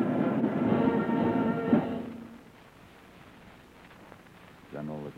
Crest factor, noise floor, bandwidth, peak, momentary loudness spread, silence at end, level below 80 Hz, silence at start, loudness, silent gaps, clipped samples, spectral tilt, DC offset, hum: 18 dB; -53 dBFS; 7.6 kHz; -12 dBFS; 22 LU; 0.05 s; -62 dBFS; 0 s; -28 LUFS; none; under 0.1%; -9 dB/octave; under 0.1%; none